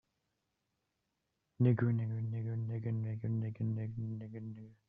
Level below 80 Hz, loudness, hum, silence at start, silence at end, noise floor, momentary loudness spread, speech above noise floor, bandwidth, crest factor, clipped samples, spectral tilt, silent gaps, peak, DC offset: -72 dBFS; -37 LUFS; none; 1.6 s; 0.15 s; -85 dBFS; 13 LU; 49 dB; 3.5 kHz; 20 dB; under 0.1%; -10.5 dB/octave; none; -18 dBFS; under 0.1%